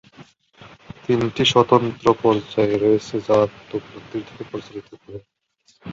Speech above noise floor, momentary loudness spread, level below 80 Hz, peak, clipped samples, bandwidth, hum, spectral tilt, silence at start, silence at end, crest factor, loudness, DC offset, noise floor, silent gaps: 39 dB; 22 LU; -54 dBFS; -2 dBFS; under 0.1%; 7.8 kHz; none; -5.5 dB/octave; 0.2 s; 0 s; 20 dB; -19 LUFS; under 0.1%; -59 dBFS; none